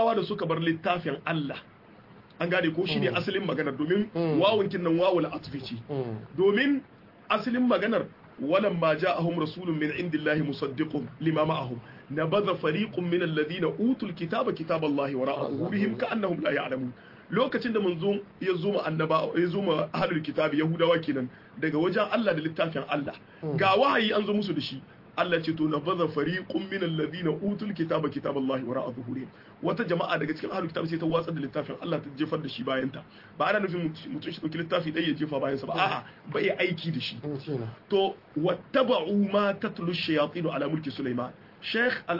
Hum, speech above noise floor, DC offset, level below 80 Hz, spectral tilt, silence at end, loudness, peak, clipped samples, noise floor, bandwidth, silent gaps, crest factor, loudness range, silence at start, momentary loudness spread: none; 24 dB; under 0.1%; -66 dBFS; -8 dB/octave; 0 s; -28 LUFS; -10 dBFS; under 0.1%; -52 dBFS; 5.8 kHz; none; 18 dB; 4 LU; 0 s; 9 LU